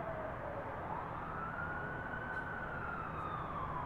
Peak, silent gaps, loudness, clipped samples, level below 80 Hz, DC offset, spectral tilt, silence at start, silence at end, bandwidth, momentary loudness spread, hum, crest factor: -28 dBFS; none; -42 LUFS; under 0.1%; -54 dBFS; under 0.1%; -8 dB/octave; 0 s; 0 s; 15.5 kHz; 2 LU; none; 14 dB